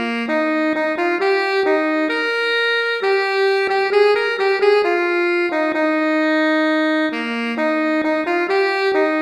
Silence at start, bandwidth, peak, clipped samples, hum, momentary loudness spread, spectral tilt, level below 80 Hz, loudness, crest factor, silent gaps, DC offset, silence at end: 0 s; 11.5 kHz; -4 dBFS; under 0.1%; none; 4 LU; -3.5 dB/octave; -66 dBFS; -17 LUFS; 14 dB; none; under 0.1%; 0 s